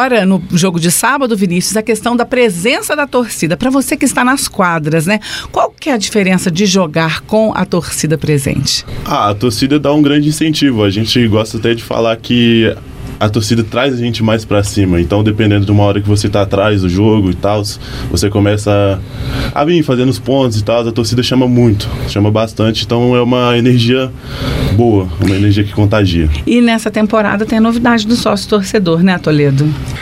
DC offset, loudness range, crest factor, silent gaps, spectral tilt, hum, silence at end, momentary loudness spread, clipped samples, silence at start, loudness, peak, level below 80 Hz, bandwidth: under 0.1%; 2 LU; 12 dB; none; -5.5 dB/octave; none; 0 s; 5 LU; under 0.1%; 0 s; -12 LUFS; 0 dBFS; -30 dBFS; 16 kHz